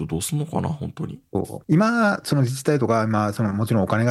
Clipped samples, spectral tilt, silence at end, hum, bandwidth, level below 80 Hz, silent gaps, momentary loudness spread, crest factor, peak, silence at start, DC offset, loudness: under 0.1%; -6.5 dB/octave; 0 s; none; 14.5 kHz; -52 dBFS; none; 10 LU; 16 dB; -4 dBFS; 0 s; under 0.1%; -22 LUFS